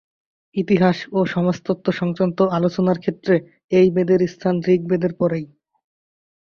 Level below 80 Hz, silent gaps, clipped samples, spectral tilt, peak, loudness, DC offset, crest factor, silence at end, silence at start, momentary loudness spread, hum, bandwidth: -58 dBFS; 3.64-3.69 s; under 0.1%; -8 dB/octave; -4 dBFS; -20 LUFS; under 0.1%; 16 dB; 1 s; 0.55 s; 6 LU; none; 6.8 kHz